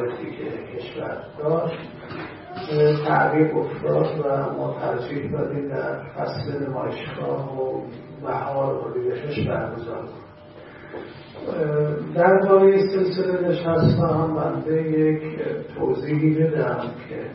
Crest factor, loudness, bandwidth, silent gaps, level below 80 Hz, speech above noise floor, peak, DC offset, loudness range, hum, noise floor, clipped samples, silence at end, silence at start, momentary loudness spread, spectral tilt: 18 dB; -23 LUFS; 5.8 kHz; none; -54 dBFS; 21 dB; -4 dBFS; under 0.1%; 9 LU; none; -43 dBFS; under 0.1%; 0 s; 0 s; 16 LU; -12 dB/octave